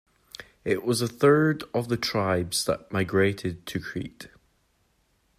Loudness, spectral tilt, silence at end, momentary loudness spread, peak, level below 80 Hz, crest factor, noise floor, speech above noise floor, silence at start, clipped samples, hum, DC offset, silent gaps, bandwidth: -26 LUFS; -5 dB/octave; 1.1 s; 22 LU; -8 dBFS; -58 dBFS; 20 dB; -68 dBFS; 43 dB; 0.4 s; under 0.1%; none; under 0.1%; none; 15.5 kHz